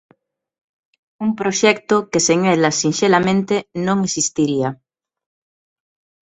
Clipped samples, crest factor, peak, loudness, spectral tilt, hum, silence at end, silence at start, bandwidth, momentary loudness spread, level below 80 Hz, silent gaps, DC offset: under 0.1%; 18 dB; 0 dBFS; -17 LUFS; -4 dB/octave; none; 1.55 s; 1.2 s; 8.4 kHz; 7 LU; -58 dBFS; none; under 0.1%